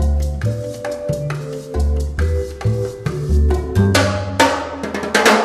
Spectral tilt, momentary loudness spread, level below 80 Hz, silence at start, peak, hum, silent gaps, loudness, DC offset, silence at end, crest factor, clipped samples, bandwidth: -5 dB/octave; 10 LU; -22 dBFS; 0 s; 0 dBFS; none; none; -19 LUFS; under 0.1%; 0 s; 16 dB; under 0.1%; 14 kHz